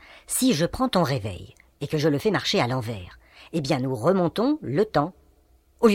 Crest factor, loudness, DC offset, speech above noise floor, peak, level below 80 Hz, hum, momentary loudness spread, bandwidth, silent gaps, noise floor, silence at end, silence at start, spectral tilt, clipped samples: 18 dB; -24 LUFS; under 0.1%; 36 dB; -6 dBFS; -50 dBFS; none; 12 LU; 17.5 kHz; none; -59 dBFS; 0 s; 0.15 s; -5 dB/octave; under 0.1%